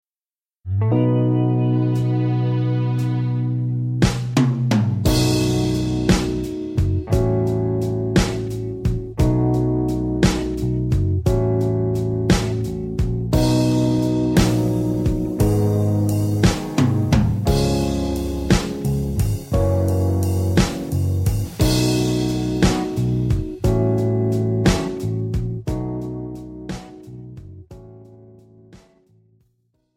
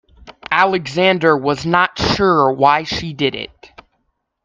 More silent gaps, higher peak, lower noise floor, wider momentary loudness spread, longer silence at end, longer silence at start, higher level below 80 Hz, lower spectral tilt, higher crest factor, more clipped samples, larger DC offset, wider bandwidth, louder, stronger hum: neither; about the same, -2 dBFS vs 0 dBFS; first, under -90 dBFS vs -69 dBFS; about the same, 7 LU vs 9 LU; first, 1.2 s vs 0.8 s; first, 0.65 s vs 0.25 s; first, -30 dBFS vs -44 dBFS; first, -6.5 dB/octave vs -5 dB/octave; about the same, 16 dB vs 16 dB; neither; neither; first, 16.5 kHz vs 7.6 kHz; second, -20 LUFS vs -15 LUFS; neither